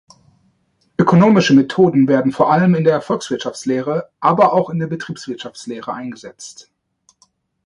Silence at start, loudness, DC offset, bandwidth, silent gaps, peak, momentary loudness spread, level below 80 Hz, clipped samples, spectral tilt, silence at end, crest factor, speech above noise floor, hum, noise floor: 1 s; -15 LUFS; under 0.1%; 11 kHz; none; 0 dBFS; 17 LU; -58 dBFS; under 0.1%; -6.5 dB/octave; 1.15 s; 16 dB; 47 dB; none; -62 dBFS